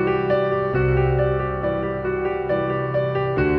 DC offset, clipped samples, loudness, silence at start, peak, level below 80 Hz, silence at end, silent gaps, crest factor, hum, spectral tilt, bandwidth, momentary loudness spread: under 0.1%; under 0.1%; -22 LUFS; 0 s; -8 dBFS; -34 dBFS; 0 s; none; 12 dB; none; -10.5 dB/octave; 5.4 kHz; 5 LU